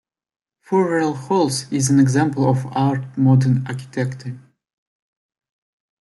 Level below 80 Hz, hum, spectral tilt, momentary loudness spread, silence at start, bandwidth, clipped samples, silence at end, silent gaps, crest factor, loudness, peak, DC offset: -60 dBFS; none; -6.5 dB/octave; 11 LU; 0.7 s; 12 kHz; under 0.1%; 1.6 s; none; 16 dB; -19 LUFS; -4 dBFS; under 0.1%